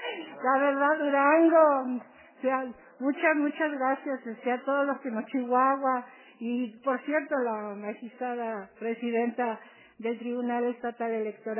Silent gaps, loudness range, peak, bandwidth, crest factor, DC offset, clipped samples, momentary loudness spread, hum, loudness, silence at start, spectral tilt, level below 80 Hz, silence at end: none; 7 LU; -10 dBFS; 3.2 kHz; 18 dB; under 0.1%; under 0.1%; 13 LU; none; -28 LUFS; 0 s; -8.5 dB/octave; -82 dBFS; 0 s